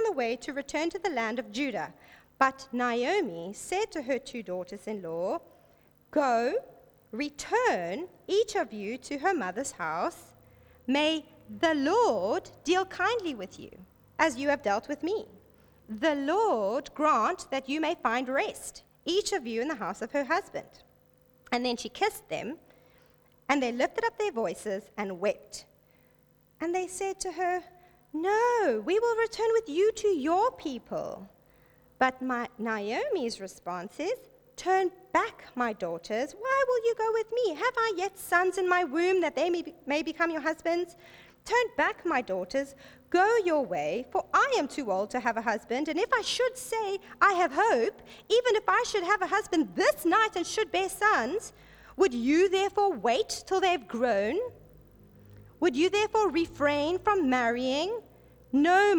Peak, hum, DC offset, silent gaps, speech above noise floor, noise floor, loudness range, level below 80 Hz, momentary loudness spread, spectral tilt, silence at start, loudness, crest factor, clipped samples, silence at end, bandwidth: -8 dBFS; none; under 0.1%; none; 35 dB; -64 dBFS; 6 LU; -64 dBFS; 11 LU; -3.5 dB/octave; 0 s; -29 LUFS; 22 dB; under 0.1%; 0 s; 19 kHz